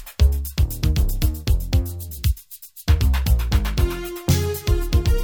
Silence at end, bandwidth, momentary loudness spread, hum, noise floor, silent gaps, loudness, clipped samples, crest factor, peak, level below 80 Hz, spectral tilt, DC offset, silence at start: 0 s; over 20 kHz; 6 LU; none; -41 dBFS; none; -22 LUFS; under 0.1%; 14 dB; -6 dBFS; -22 dBFS; -5.5 dB/octave; 0.1%; 0 s